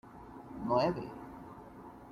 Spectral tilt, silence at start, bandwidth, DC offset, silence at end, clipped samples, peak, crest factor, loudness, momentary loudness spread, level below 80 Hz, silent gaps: -7.5 dB/octave; 0.05 s; 14 kHz; under 0.1%; 0 s; under 0.1%; -18 dBFS; 20 dB; -34 LUFS; 20 LU; -62 dBFS; none